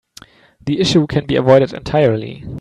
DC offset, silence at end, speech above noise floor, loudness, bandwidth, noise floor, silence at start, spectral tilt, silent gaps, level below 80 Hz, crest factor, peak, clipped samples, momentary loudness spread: under 0.1%; 0 s; 29 dB; -15 LUFS; 11.5 kHz; -44 dBFS; 0.65 s; -6.5 dB/octave; none; -44 dBFS; 16 dB; 0 dBFS; under 0.1%; 12 LU